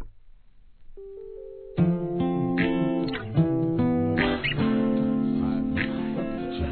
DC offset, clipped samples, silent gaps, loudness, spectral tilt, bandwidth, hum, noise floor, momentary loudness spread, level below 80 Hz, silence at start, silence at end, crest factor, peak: 0.2%; under 0.1%; none; -25 LUFS; -11 dB/octave; 4.5 kHz; none; -52 dBFS; 14 LU; -44 dBFS; 0 s; 0 s; 18 dB; -8 dBFS